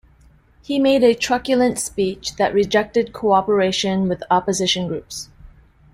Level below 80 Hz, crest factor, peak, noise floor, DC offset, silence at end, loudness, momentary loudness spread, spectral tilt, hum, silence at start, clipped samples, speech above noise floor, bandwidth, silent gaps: -50 dBFS; 16 dB; -2 dBFS; -52 dBFS; under 0.1%; 0.45 s; -19 LUFS; 9 LU; -4 dB/octave; none; 0.7 s; under 0.1%; 33 dB; 16 kHz; none